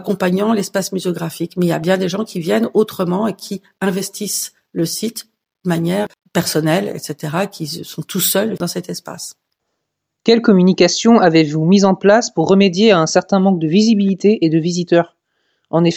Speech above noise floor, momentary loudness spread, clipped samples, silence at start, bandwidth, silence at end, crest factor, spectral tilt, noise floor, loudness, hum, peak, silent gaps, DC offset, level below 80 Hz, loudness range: 60 dB; 14 LU; under 0.1%; 0 s; 16.5 kHz; 0 s; 16 dB; -5 dB/octave; -75 dBFS; -15 LUFS; none; 0 dBFS; none; under 0.1%; -60 dBFS; 8 LU